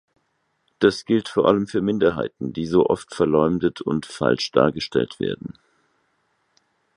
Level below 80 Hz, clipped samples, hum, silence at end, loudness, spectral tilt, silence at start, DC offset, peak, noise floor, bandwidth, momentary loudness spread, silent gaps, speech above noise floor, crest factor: -52 dBFS; under 0.1%; none; 1.5 s; -21 LUFS; -6 dB/octave; 0.8 s; under 0.1%; -2 dBFS; -70 dBFS; 11.5 kHz; 9 LU; none; 50 dB; 22 dB